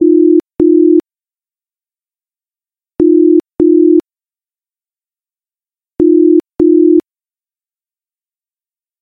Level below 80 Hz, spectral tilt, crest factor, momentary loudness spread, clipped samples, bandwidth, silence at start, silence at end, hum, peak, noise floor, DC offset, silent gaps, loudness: -48 dBFS; -11 dB/octave; 12 dB; 6 LU; under 0.1%; 1.6 kHz; 0 s; 2 s; none; 0 dBFS; under -90 dBFS; under 0.1%; none; -9 LUFS